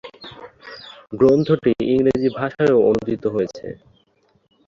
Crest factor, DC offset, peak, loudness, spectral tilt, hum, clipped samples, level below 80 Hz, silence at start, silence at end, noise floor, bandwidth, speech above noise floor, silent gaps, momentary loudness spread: 18 dB; under 0.1%; -2 dBFS; -18 LUFS; -8 dB/octave; none; under 0.1%; -50 dBFS; 0.05 s; 0.95 s; -61 dBFS; 7.4 kHz; 44 dB; none; 22 LU